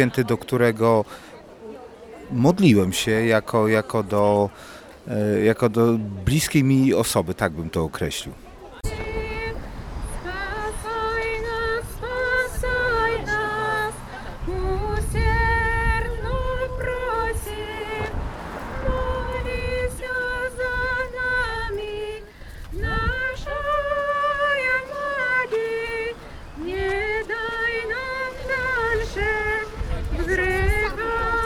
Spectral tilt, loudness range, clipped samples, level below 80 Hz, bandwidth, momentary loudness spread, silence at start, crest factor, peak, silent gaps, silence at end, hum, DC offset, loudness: -5.5 dB/octave; 7 LU; under 0.1%; -32 dBFS; 19 kHz; 14 LU; 0 s; 20 dB; -2 dBFS; none; 0 s; none; under 0.1%; -23 LUFS